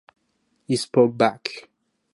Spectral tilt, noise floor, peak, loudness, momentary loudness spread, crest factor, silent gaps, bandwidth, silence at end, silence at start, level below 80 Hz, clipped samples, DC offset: -5.5 dB/octave; -70 dBFS; -4 dBFS; -22 LUFS; 14 LU; 20 dB; none; 11.5 kHz; 0.55 s; 0.7 s; -70 dBFS; under 0.1%; under 0.1%